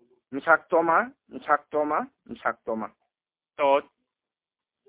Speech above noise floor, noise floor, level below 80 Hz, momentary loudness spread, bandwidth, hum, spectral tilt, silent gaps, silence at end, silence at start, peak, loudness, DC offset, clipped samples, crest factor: over 65 dB; under -90 dBFS; -72 dBFS; 15 LU; 4 kHz; none; -8 dB/octave; none; 1.05 s; 0.3 s; -4 dBFS; -25 LUFS; under 0.1%; under 0.1%; 24 dB